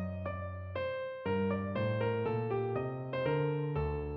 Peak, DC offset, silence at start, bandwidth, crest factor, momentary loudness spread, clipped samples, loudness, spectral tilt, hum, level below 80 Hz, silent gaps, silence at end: -22 dBFS; under 0.1%; 0 s; 5.2 kHz; 14 dB; 6 LU; under 0.1%; -35 LUFS; -10.5 dB/octave; none; -52 dBFS; none; 0 s